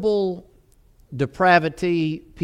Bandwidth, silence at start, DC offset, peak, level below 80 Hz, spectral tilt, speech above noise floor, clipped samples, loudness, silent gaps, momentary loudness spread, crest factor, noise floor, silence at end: 11.5 kHz; 0 s; under 0.1%; -4 dBFS; -52 dBFS; -7 dB/octave; 34 dB; under 0.1%; -21 LUFS; none; 15 LU; 18 dB; -55 dBFS; 0 s